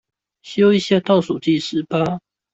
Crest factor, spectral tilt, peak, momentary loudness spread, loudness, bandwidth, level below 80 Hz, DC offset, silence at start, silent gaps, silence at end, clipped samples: 14 dB; -6.5 dB/octave; -4 dBFS; 9 LU; -18 LUFS; 8 kHz; -58 dBFS; under 0.1%; 0.45 s; none; 0.35 s; under 0.1%